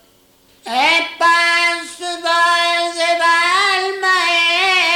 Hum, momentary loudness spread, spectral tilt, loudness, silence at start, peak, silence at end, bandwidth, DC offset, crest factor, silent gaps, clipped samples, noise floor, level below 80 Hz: none; 5 LU; 0.5 dB/octave; -14 LUFS; 0.65 s; -4 dBFS; 0 s; 18 kHz; under 0.1%; 12 dB; none; under 0.1%; -52 dBFS; -60 dBFS